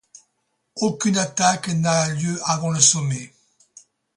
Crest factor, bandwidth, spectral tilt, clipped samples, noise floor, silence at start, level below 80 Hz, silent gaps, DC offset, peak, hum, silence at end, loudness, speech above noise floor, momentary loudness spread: 22 dB; 11.5 kHz; -3.5 dB/octave; under 0.1%; -73 dBFS; 0.75 s; -62 dBFS; none; under 0.1%; -2 dBFS; none; 0.9 s; -20 LUFS; 52 dB; 10 LU